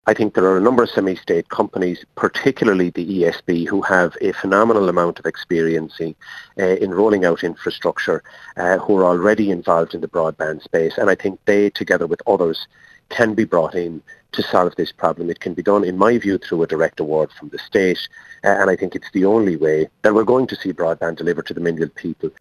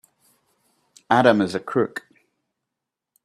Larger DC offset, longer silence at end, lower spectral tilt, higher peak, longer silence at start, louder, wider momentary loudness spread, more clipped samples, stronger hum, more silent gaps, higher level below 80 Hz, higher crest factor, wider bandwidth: neither; second, 0.1 s vs 1.25 s; about the same, -6.5 dB/octave vs -6 dB/octave; about the same, 0 dBFS vs -2 dBFS; second, 0.05 s vs 1.1 s; about the same, -18 LUFS vs -20 LUFS; about the same, 9 LU vs 11 LU; neither; neither; neither; first, -54 dBFS vs -68 dBFS; second, 18 dB vs 24 dB; about the same, 13 kHz vs 13.5 kHz